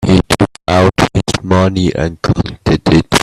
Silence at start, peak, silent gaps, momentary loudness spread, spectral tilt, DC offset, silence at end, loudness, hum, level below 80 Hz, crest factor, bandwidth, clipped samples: 0 s; 0 dBFS; none; 5 LU; -5.5 dB/octave; under 0.1%; 0 s; -13 LUFS; none; -30 dBFS; 12 dB; 13.5 kHz; under 0.1%